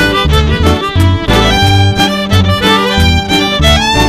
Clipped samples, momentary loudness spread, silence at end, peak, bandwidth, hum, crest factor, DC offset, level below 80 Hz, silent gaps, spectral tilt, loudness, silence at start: 0.7%; 3 LU; 0 s; 0 dBFS; 15.5 kHz; none; 8 dB; under 0.1%; -18 dBFS; none; -5 dB/octave; -9 LUFS; 0 s